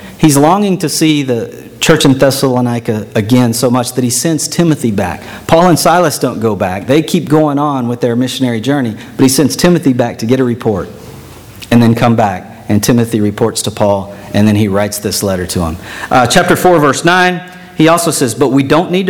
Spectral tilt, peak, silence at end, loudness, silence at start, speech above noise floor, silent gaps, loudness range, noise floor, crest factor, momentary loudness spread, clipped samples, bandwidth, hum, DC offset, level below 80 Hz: -5 dB/octave; 0 dBFS; 0 s; -11 LUFS; 0 s; 21 dB; none; 2 LU; -32 dBFS; 10 dB; 8 LU; 0.6%; 19 kHz; none; under 0.1%; -38 dBFS